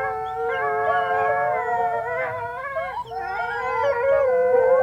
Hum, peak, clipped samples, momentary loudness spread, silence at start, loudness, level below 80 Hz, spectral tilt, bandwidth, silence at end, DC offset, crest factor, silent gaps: none; -8 dBFS; under 0.1%; 10 LU; 0 s; -23 LUFS; -54 dBFS; -5 dB/octave; 7.6 kHz; 0 s; under 0.1%; 14 dB; none